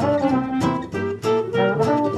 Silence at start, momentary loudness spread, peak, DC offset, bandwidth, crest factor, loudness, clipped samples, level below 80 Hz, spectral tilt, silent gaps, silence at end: 0 s; 5 LU; -6 dBFS; under 0.1%; 13 kHz; 14 dB; -21 LUFS; under 0.1%; -50 dBFS; -7 dB/octave; none; 0 s